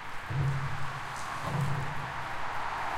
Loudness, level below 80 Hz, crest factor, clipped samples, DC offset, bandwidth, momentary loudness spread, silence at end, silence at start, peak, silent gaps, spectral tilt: -34 LUFS; -50 dBFS; 14 dB; under 0.1%; under 0.1%; 15 kHz; 5 LU; 0 s; 0 s; -18 dBFS; none; -5.5 dB/octave